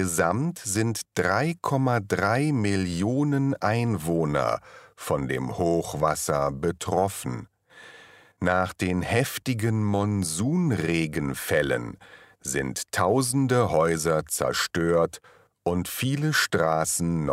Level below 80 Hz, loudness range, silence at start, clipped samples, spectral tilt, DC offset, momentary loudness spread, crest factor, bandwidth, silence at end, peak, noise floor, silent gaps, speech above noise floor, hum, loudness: -52 dBFS; 3 LU; 0 s; under 0.1%; -5 dB/octave; under 0.1%; 6 LU; 18 dB; 16 kHz; 0 s; -8 dBFS; -51 dBFS; none; 27 dB; none; -25 LUFS